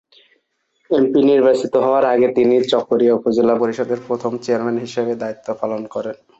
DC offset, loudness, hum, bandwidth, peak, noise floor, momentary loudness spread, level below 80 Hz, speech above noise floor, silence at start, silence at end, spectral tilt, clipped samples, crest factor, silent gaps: under 0.1%; -17 LUFS; none; 8.2 kHz; -4 dBFS; -66 dBFS; 10 LU; -60 dBFS; 50 dB; 0.9 s; 0.25 s; -6 dB/octave; under 0.1%; 14 dB; none